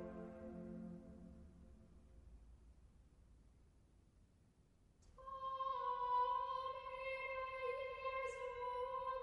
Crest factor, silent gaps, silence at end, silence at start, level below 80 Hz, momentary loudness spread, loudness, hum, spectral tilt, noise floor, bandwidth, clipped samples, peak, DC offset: 16 dB; none; 0 s; 0 s; -68 dBFS; 25 LU; -45 LUFS; none; -5.5 dB/octave; -72 dBFS; 11 kHz; under 0.1%; -30 dBFS; under 0.1%